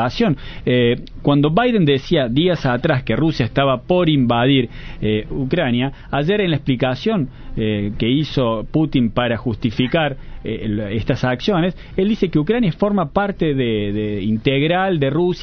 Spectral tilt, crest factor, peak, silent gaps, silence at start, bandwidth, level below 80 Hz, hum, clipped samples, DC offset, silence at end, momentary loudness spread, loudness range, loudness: -8 dB/octave; 16 dB; -2 dBFS; none; 0 s; 6.6 kHz; -36 dBFS; none; under 0.1%; under 0.1%; 0 s; 6 LU; 3 LU; -18 LUFS